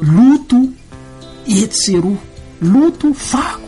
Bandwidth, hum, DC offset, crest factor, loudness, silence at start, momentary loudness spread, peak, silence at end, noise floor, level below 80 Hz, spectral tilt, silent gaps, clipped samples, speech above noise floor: 11.5 kHz; none; under 0.1%; 12 dB; -13 LUFS; 0 s; 10 LU; -2 dBFS; 0 s; -35 dBFS; -40 dBFS; -5.5 dB/octave; none; under 0.1%; 21 dB